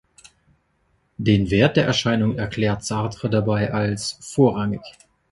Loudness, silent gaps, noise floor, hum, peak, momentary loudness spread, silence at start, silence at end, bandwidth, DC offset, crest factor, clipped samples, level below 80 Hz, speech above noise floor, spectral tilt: -21 LUFS; none; -66 dBFS; none; -2 dBFS; 9 LU; 1.2 s; 0.4 s; 11.5 kHz; under 0.1%; 20 dB; under 0.1%; -46 dBFS; 46 dB; -6 dB/octave